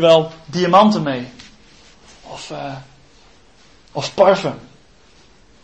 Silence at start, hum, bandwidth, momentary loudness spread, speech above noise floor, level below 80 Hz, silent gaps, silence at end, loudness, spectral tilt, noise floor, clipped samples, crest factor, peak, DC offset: 0 s; none; 8.6 kHz; 23 LU; 35 dB; -54 dBFS; none; 1.05 s; -16 LUFS; -5.5 dB/octave; -50 dBFS; under 0.1%; 18 dB; 0 dBFS; 0.2%